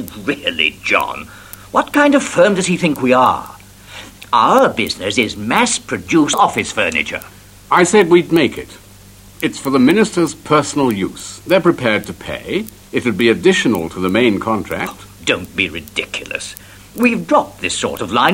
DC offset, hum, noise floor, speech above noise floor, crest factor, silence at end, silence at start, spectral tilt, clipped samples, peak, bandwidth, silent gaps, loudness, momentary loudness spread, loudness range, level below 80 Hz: under 0.1%; none; -41 dBFS; 26 dB; 16 dB; 0 s; 0 s; -4 dB/octave; under 0.1%; 0 dBFS; 16.5 kHz; none; -15 LUFS; 14 LU; 4 LU; -48 dBFS